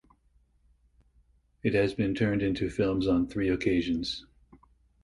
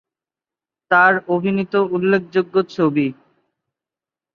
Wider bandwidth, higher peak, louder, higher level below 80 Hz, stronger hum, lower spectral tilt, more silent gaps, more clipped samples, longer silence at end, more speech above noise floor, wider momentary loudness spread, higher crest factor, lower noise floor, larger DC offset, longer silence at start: first, 11.5 kHz vs 6.8 kHz; second, -12 dBFS vs -2 dBFS; second, -28 LUFS vs -17 LUFS; first, -50 dBFS vs -64 dBFS; neither; about the same, -7 dB/octave vs -8 dB/octave; neither; neither; second, 0.8 s vs 1.2 s; second, 39 dB vs 73 dB; about the same, 6 LU vs 7 LU; about the same, 18 dB vs 18 dB; second, -66 dBFS vs -90 dBFS; neither; first, 1.65 s vs 0.9 s